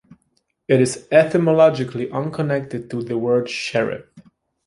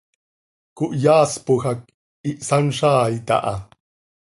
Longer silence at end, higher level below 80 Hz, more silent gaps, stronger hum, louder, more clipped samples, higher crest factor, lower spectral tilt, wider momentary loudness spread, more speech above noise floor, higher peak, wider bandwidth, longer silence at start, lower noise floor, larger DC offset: second, 0.45 s vs 0.6 s; about the same, -58 dBFS vs -54 dBFS; second, none vs 1.94-2.24 s; neither; about the same, -19 LUFS vs -19 LUFS; neither; about the same, 18 dB vs 18 dB; about the same, -6 dB/octave vs -5.5 dB/octave; about the same, 12 LU vs 14 LU; second, 50 dB vs over 71 dB; about the same, -2 dBFS vs -2 dBFS; about the same, 11.5 kHz vs 11.5 kHz; about the same, 0.7 s vs 0.75 s; second, -68 dBFS vs under -90 dBFS; neither